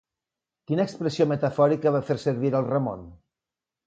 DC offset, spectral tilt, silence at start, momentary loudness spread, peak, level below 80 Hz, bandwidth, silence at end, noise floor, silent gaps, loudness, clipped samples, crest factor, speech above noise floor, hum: under 0.1%; -7.5 dB/octave; 0.7 s; 7 LU; -8 dBFS; -60 dBFS; 8.8 kHz; 0.7 s; -89 dBFS; none; -25 LUFS; under 0.1%; 18 dB; 65 dB; none